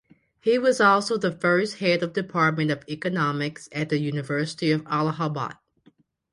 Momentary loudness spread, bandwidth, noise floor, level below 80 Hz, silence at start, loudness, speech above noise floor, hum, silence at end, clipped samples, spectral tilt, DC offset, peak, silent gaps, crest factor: 10 LU; 11.5 kHz; -61 dBFS; -66 dBFS; 0.45 s; -24 LUFS; 37 dB; none; 0.8 s; under 0.1%; -5.5 dB/octave; under 0.1%; -4 dBFS; none; 20 dB